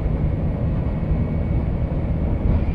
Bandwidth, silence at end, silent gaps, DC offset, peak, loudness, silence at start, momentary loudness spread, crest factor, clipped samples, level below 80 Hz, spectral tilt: 4.7 kHz; 0 s; none; under 0.1%; -8 dBFS; -23 LUFS; 0 s; 2 LU; 12 dB; under 0.1%; -24 dBFS; -11 dB/octave